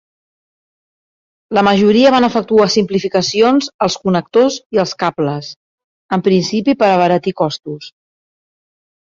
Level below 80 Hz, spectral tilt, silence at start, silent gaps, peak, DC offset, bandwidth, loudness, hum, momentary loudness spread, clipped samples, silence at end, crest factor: -56 dBFS; -5.5 dB/octave; 1.5 s; 3.74-3.79 s, 4.66-4.70 s, 5.56-5.78 s, 5.84-6.09 s; -2 dBFS; under 0.1%; 7.6 kHz; -14 LUFS; none; 9 LU; under 0.1%; 1.3 s; 14 dB